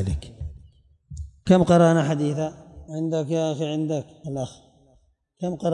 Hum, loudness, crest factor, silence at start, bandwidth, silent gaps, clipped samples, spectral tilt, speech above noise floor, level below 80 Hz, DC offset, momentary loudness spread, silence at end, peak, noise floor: none; -23 LUFS; 18 dB; 0 s; 10.5 kHz; none; under 0.1%; -7 dB/octave; 40 dB; -44 dBFS; under 0.1%; 22 LU; 0 s; -6 dBFS; -62 dBFS